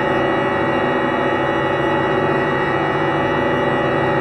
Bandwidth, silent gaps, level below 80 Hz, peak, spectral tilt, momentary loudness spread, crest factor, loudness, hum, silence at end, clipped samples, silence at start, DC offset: 9.4 kHz; none; -44 dBFS; -6 dBFS; -7 dB/octave; 1 LU; 12 dB; -18 LUFS; none; 0 s; under 0.1%; 0 s; 0.3%